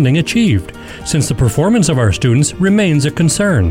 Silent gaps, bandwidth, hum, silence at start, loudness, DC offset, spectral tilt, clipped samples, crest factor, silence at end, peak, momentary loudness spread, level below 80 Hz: none; 16.5 kHz; none; 0 s; -13 LUFS; under 0.1%; -5.5 dB/octave; under 0.1%; 10 dB; 0 s; -2 dBFS; 6 LU; -32 dBFS